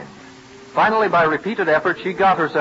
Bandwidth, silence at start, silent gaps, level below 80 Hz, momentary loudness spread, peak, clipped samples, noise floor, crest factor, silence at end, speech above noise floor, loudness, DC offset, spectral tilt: 8 kHz; 0 s; none; -56 dBFS; 5 LU; -6 dBFS; under 0.1%; -41 dBFS; 14 dB; 0 s; 24 dB; -18 LUFS; under 0.1%; -6 dB/octave